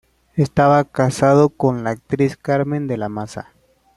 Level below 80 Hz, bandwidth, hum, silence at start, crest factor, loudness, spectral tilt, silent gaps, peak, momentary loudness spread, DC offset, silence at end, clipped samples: -50 dBFS; 12 kHz; none; 0.35 s; 16 dB; -18 LUFS; -7.5 dB/octave; none; -2 dBFS; 14 LU; under 0.1%; 0.55 s; under 0.1%